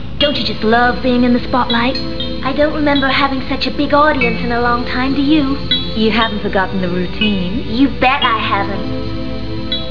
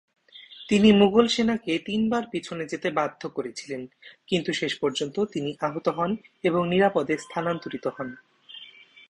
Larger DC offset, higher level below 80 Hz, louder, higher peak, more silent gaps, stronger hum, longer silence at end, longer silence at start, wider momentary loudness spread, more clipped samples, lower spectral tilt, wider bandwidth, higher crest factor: first, 7% vs under 0.1%; first, -30 dBFS vs -60 dBFS; first, -15 LUFS vs -25 LUFS; first, 0 dBFS vs -6 dBFS; neither; neither; second, 0 s vs 0.4 s; second, 0 s vs 0.35 s; second, 8 LU vs 17 LU; neither; first, -7 dB/octave vs -5.5 dB/octave; second, 5.4 kHz vs 10.5 kHz; about the same, 16 dB vs 20 dB